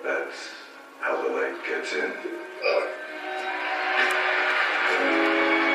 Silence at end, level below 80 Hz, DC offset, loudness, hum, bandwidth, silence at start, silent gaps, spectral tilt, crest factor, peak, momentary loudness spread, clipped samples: 0 s; -88 dBFS; under 0.1%; -25 LUFS; none; 13.5 kHz; 0 s; none; -1.5 dB/octave; 16 dB; -10 dBFS; 13 LU; under 0.1%